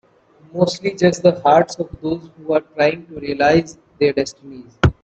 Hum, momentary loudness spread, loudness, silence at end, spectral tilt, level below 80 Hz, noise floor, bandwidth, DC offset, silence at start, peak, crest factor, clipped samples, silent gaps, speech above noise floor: none; 13 LU; -18 LUFS; 0.1 s; -6 dB/octave; -40 dBFS; -51 dBFS; 8.6 kHz; under 0.1%; 0.55 s; 0 dBFS; 18 dB; under 0.1%; none; 33 dB